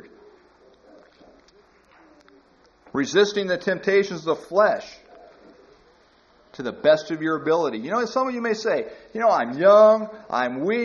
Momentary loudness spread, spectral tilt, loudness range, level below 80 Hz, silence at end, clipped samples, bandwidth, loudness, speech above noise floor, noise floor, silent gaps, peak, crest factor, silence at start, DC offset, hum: 12 LU; -3 dB/octave; 7 LU; -66 dBFS; 0 s; under 0.1%; 7.2 kHz; -21 LUFS; 36 dB; -57 dBFS; none; -4 dBFS; 18 dB; 2.95 s; under 0.1%; none